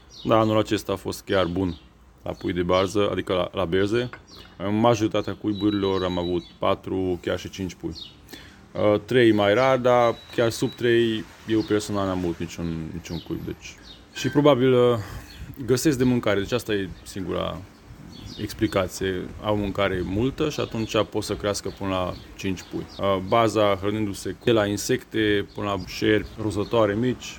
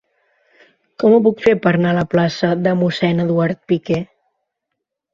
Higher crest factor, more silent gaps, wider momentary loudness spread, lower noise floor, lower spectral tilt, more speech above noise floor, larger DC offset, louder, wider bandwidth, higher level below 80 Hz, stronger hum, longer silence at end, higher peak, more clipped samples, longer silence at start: about the same, 20 dB vs 16 dB; neither; first, 15 LU vs 8 LU; second, -43 dBFS vs -78 dBFS; second, -5.5 dB/octave vs -7.5 dB/octave; second, 19 dB vs 63 dB; neither; second, -24 LUFS vs -16 LUFS; first, 19 kHz vs 7.4 kHz; first, -48 dBFS vs -54 dBFS; neither; second, 0 s vs 1.1 s; about the same, -4 dBFS vs -2 dBFS; neither; second, 0.1 s vs 1 s